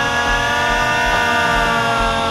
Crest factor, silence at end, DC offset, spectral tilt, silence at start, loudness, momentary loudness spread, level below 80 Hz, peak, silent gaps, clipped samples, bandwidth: 12 dB; 0 s; under 0.1%; -3 dB/octave; 0 s; -15 LUFS; 1 LU; -30 dBFS; -4 dBFS; none; under 0.1%; 14 kHz